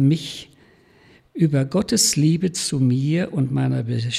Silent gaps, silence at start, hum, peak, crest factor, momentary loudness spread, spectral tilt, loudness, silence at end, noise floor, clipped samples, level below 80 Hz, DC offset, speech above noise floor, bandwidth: none; 0 s; none; -6 dBFS; 16 dB; 8 LU; -5 dB/octave; -20 LUFS; 0 s; -53 dBFS; under 0.1%; -54 dBFS; under 0.1%; 33 dB; 14.5 kHz